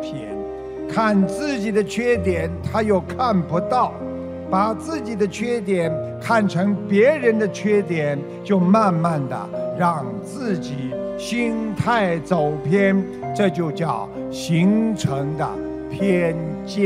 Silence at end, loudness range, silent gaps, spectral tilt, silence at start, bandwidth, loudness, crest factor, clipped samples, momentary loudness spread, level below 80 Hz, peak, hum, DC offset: 0 s; 3 LU; none; -7 dB/octave; 0 s; 12.5 kHz; -21 LUFS; 16 dB; under 0.1%; 10 LU; -50 dBFS; -4 dBFS; none; under 0.1%